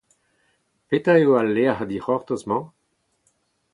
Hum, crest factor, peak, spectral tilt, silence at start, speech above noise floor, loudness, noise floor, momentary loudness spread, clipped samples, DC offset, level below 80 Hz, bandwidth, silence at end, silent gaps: none; 18 dB; -4 dBFS; -7.5 dB/octave; 0.9 s; 50 dB; -21 LUFS; -71 dBFS; 11 LU; under 0.1%; under 0.1%; -62 dBFS; 11 kHz; 1.05 s; none